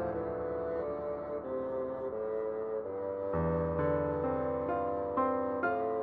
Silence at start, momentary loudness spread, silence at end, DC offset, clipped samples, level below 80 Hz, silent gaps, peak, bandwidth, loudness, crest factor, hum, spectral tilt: 0 s; 6 LU; 0 s; under 0.1%; under 0.1%; -54 dBFS; none; -20 dBFS; 4.5 kHz; -34 LUFS; 14 dB; none; -11 dB/octave